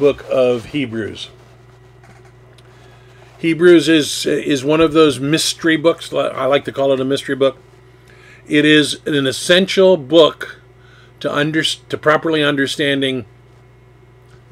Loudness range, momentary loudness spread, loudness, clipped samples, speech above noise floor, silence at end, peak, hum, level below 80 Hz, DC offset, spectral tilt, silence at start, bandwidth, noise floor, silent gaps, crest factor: 4 LU; 11 LU; -15 LUFS; under 0.1%; 31 dB; 1.25 s; 0 dBFS; none; -52 dBFS; under 0.1%; -4.5 dB/octave; 0 s; 16 kHz; -45 dBFS; none; 16 dB